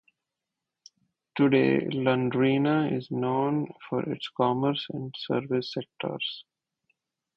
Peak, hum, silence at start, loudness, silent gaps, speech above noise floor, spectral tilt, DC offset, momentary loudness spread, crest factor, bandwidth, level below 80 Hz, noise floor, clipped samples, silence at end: -10 dBFS; none; 1.35 s; -27 LUFS; none; 60 dB; -8 dB/octave; under 0.1%; 11 LU; 18 dB; 6.4 kHz; -68 dBFS; -87 dBFS; under 0.1%; 0.95 s